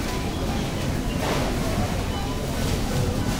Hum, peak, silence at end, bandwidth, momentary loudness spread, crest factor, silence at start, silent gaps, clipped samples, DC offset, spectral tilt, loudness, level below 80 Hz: none; -12 dBFS; 0 s; 16 kHz; 3 LU; 14 dB; 0 s; none; under 0.1%; under 0.1%; -5 dB/octave; -26 LUFS; -32 dBFS